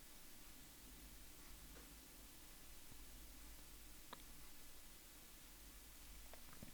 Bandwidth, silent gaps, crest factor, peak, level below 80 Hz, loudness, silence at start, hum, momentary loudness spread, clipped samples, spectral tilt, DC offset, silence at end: over 20 kHz; none; 22 dB; -38 dBFS; -64 dBFS; -59 LUFS; 0 s; none; 2 LU; under 0.1%; -2.5 dB/octave; under 0.1%; 0 s